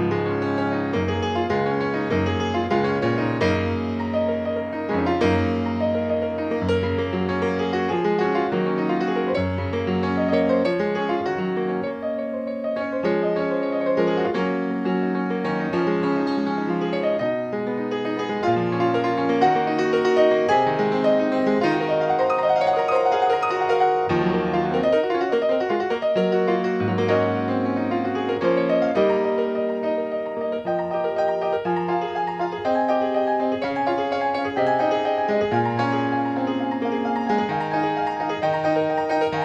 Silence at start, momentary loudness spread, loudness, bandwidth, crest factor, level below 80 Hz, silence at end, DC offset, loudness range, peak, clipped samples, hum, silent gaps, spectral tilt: 0 s; 5 LU; -22 LUFS; 8.6 kHz; 16 dB; -54 dBFS; 0 s; under 0.1%; 4 LU; -6 dBFS; under 0.1%; none; none; -7 dB/octave